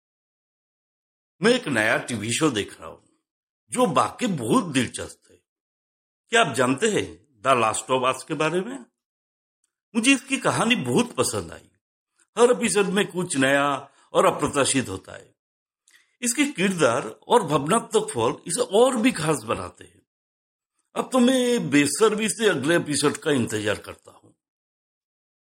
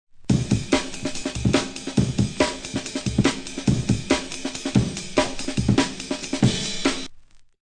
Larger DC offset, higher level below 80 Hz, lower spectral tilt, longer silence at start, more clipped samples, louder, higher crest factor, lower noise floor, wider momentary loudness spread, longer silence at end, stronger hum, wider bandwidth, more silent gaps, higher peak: neither; second, -62 dBFS vs -38 dBFS; about the same, -4 dB/octave vs -5 dB/octave; first, 1.4 s vs 0.15 s; neither; about the same, -22 LUFS vs -24 LUFS; about the same, 20 dB vs 18 dB; first, -61 dBFS vs -45 dBFS; first, 12 LU vs 7 LU; first, 1.65 s vs 0.2 s; neither; first, 16 kHz vs 10.5 kHz; first, 3.31-3.67 s, 5.49-6.24 s, 9.05-9.63 s, 9.83-9.92 s, 11.81-12.07 s, 12.28-12.33 s, 15.39-15.66 s, 20.07-20.59 s vs none; about the same, -4 dBFS vs -4 dBFS